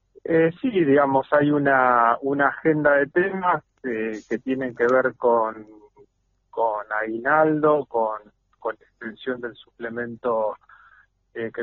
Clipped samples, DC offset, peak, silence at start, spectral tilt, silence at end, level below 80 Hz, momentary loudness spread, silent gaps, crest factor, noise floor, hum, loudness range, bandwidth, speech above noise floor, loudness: under 0.1%; under 0.1%; -4 dBFS; 0.25 s; -5.5 dB/octave; 0 s; -64 dBFS; 15 LU; none; 18 dB; -66 dBFS; none; 9 LU; 7 kHz; 44 dB; -22 LUFS